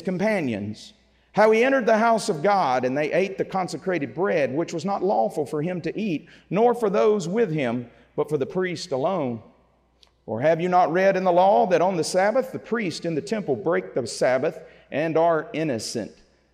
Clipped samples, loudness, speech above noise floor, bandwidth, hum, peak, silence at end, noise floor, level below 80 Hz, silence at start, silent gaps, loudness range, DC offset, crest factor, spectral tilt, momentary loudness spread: under 0.1%; -23 LUFS; 39 dB; 14.5 kHz; none; -6 dBFS; 0.45 s; -61 dBFS; -66 dBFS; 0 s; none; 4 LU; under 0.1%; 16 dB; -5.5 dB/octave; 10 LU